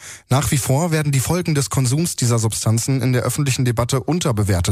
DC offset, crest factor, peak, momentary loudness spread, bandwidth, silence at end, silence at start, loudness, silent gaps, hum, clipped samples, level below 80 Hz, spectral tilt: under 0.1%; 12 dB; -6 dBFS; 2 LU; 15.5 kHz; 0 s; 0 s; -19 LUFS; none; none; under 0.1%; -40 dBFS; -5 dB/octave